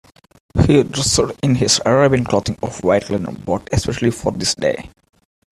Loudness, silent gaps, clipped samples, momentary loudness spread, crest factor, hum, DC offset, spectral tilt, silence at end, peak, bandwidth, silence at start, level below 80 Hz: -17 LUFS; none; under 0.1%; 10 LU; 18 dB; none; under 0.1%; -4.5 dB/octave; 0.65 s; 0 dBFS; 13.5 kHz; 0.55 s; -38 dBFS